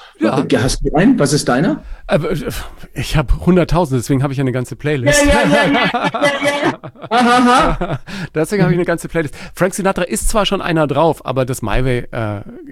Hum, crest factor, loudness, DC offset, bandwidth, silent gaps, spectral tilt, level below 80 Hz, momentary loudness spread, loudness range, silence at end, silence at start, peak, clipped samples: none; 14 dB; -15 LUFS; under 0.1%; 16 kHz; none; -5 dB/octave; -26 dBFS; 11 LU; 4 LU; 0 s; 0 s; 0 dBFS; under 0.1%